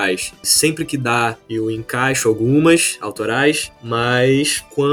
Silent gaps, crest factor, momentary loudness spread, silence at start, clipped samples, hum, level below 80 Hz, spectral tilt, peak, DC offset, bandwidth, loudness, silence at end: none; 16 dB; 9 LU; 0 s; under 0.1%; none; -50 dBFS; -3.5 dB/octave; -2 dBFS; under 0.1%; 19 kHz; -17 LUFS; 0 s